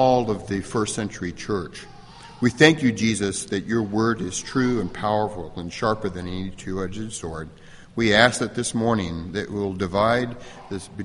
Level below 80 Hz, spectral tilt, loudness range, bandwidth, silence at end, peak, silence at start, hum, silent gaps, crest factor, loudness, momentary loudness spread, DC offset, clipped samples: -48 dBFS; -4.5 dB/octave; 5 LU; 11.5 kHz; 0 s; 0 dBFS; 0 s; none; none; 24 dB; -23 LUFS; 17 LU; under 0.1%; under 0.1%